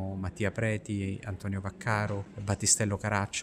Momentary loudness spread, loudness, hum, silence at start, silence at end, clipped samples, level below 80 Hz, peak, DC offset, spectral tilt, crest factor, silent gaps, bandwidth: 11 LU; -31 LUFS; none; 0 s; 0 s; under 0.1%; -56 dBFS; -10 dBFS; under 0.1%; -4 dB/octave; 20 dB; none; 15.5 kHz